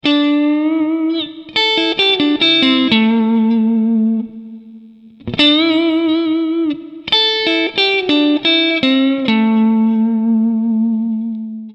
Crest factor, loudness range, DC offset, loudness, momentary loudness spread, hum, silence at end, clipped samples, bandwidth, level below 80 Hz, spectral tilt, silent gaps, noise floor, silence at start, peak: 14 dB; 2 LU; under 0.1%; -14 LUFS; 9 LU; none; 0 s; under 0.1%; 8 kHz; -56 dBFS; -5.5 dB/octave; none; -40 dBFS; 0.05 s; 0 dBFS